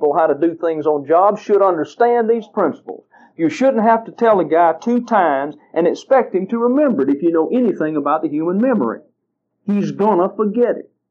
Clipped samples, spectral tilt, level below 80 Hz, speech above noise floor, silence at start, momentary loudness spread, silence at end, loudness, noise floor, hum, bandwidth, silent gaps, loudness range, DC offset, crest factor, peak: under 0.1%; -7.5 dB/octave; -74 dBFS; 57 dB; 0 s; 7 LU; 0.3 s; -16 LUFS; -72 dBFS; none; 7.6 kHz; none; 3 LU; under 0.1%; 16 dB; 0 dBFS